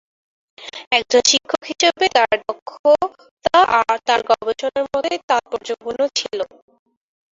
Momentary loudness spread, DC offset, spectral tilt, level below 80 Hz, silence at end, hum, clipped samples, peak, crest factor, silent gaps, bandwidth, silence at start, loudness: 13 LU; under 0.1%; -1 dB/octave; -58 dBFS; 0.9 s; none; under 0.1%; 0 dBFS; 18 dB; 0.87-0.91 s, 2.62-2.66 s, 2.79-2.84 s, 3.31-3.37 s, 5.23-5.28 s; 7.8 kHz; 0.6 s; -18 LUFS